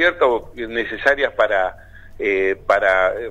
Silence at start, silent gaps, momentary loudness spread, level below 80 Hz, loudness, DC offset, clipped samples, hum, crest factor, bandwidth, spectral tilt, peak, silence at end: 0 s; none; 9 LU; -44 dBFS; -19 LUFS; under 0.1%; under 0.1%; none; 18 dB; 10.5 kHz; -4.5 dB/octave; 0 dBFS; 0 s